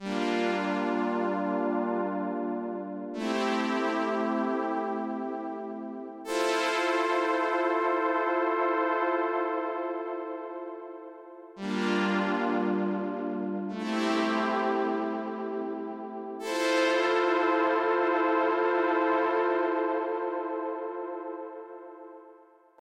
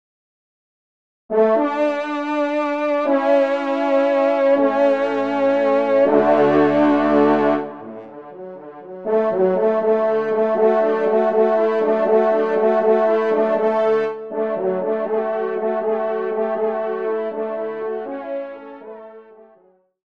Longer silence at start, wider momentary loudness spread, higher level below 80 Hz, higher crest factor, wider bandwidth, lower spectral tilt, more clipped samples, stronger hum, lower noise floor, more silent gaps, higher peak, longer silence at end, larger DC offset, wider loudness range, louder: second, 0 s vs 1.3 s; about the same, 13 LU vs 14 LU; second, -82 dBFS vs -58 dBFS; about the same, 16 dB vs 16 dB; first, 13 kHz vs 7 kHz; second, -5 dB/octave vs -7.5 dB/octave; neither; neither; about the same, -56 dBFS vs -56 dBFS; neither; second, -14 dBFS vs -2 dBFS; second, 0.5 s vs 0.85 s; second, under 0.1% vs 0.2%; about the same, 5 LU vs 7 LU; second, -29 LUFS vs -18 LUFS